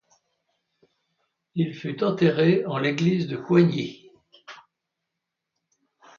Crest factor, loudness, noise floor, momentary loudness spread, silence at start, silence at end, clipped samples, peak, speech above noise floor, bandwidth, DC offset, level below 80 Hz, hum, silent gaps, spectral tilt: 20 dB; -23 LUFS; -83 dBFS; 10 LU; 1.55 s; 1.65 s; under 0.1%; -6 dBFS; 61 dB; 7 kHz; under 0.1%; -68 dBFS; none; none; -7.5 dB/octave